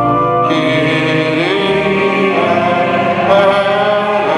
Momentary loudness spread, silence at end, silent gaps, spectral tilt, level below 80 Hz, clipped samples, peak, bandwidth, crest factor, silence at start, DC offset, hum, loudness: 3 LU; 0 s; none; -6 dB/octave; -46 dBFS; under 0.1%; 0 dBFS; 11 kHz; 12 dB; 0 s; under 0.1%; none; -12 LUFS